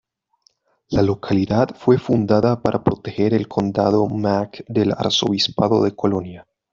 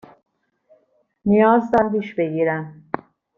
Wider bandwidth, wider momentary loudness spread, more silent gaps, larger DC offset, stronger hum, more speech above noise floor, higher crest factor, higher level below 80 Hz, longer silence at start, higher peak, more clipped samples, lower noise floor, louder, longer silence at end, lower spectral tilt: first, 7.6 kHz vs 6.6 kHz; second, 5 LU vs 16 LU; neither; neither; neither; about the same, 43 dB vs 44 dB; about the same, 16 dB vs 18 dB; first, -50 dBFS vs -56 dBFS; second, 0.9 s vs 1.25 s; about the same, -2 dBFS vs -2 dBFS; neither; about the same, -62 dBFS vs -62 dBFS; about the same, -19 LUFS vs -19 LUFS; second, 0.3 s vs 0.65 s; second, -6.5 dB/octave vs -9 dB/octave